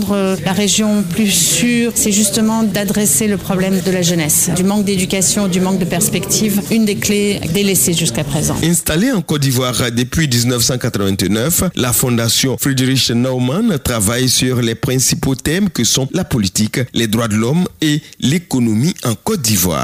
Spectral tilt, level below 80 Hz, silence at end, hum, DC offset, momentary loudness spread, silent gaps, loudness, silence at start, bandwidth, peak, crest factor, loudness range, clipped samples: -4 dB/octave; -38 dBFS; 0 s; none; under 0.1%; 4 LU; none; -14 LUFS; 0 s; 16 kHz; -4 dBFS; 10 dB; 2 LU; under 0.1%